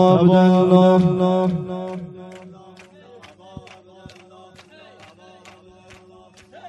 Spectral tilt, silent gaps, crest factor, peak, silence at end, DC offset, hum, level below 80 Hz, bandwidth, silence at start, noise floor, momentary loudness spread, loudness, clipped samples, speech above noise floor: -8.5 dB/octave; none; 20 dB; 0 dBFS; 0 s; under 0.1%; none; -58 dBFS; 8.2 kHz; 0 s; -48 dBFS; 26 LU; -16 LUFS; under 0.1%; 33 dB